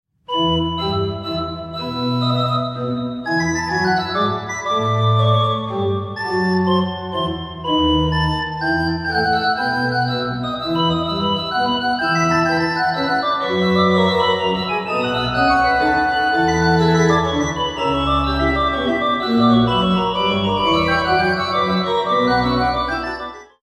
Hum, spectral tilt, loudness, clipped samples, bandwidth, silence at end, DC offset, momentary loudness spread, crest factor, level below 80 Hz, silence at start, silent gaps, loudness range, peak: none; -5.5 dB/octave; -18 LUFS; under 0.1%; 12.5 kHz; 0.2 s; under 0.1%; 8 LU; 16 dB; -38 dBFS; 0.3 s; none; 3 LU; -2 dBFS